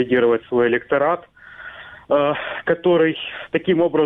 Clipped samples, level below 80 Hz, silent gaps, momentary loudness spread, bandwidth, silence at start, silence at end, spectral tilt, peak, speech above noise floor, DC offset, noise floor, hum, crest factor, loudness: under 0.1%; -58 dBFS; none; 19 LU; 3.9 kHz; 0 s; 0 s; -8.5 dB/octave; -4 dBFS; 20 dB; under 0.1%; -39 dBFS; none; 16 dB; -19 LUFS